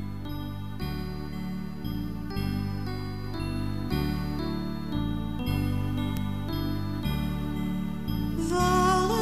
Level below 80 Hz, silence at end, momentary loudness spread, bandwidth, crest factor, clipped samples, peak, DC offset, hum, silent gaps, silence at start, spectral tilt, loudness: -38 dBFS; 0 s; 10 LU; 16 kHz; 16 dB; under 0.1%; -12 dBFS; 1%; 50 Hz at -45 dBFS; none; 0 s; -6 dB/octave; -30 LUFS